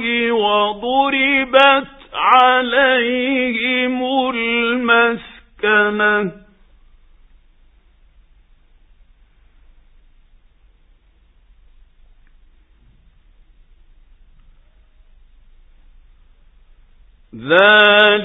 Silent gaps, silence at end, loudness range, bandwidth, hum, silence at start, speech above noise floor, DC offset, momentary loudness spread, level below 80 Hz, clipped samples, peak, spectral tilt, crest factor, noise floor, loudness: none; 0 s; 7 LU; 8 kHz; none; 0 s; 39 dB; under 0.1%; 9 LU; -50 dBFS; under 0.1%; 0 dBFS; -6 dB/octave; 18 dB; -53 dBFS; -14 LUFS